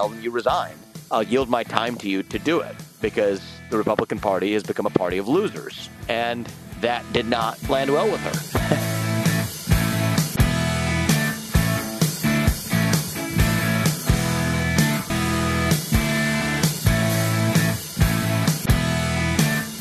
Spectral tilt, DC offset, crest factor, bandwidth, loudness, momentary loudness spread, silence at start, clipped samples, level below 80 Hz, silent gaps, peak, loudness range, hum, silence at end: -5 dB/octave; under 0.1%; 22 dB; 14 kHz; -22 LUFS; 6 LU; 0 s; under 0.1%; -34 dBFS; none; 0 dBFS; 3 LU; none; 0 s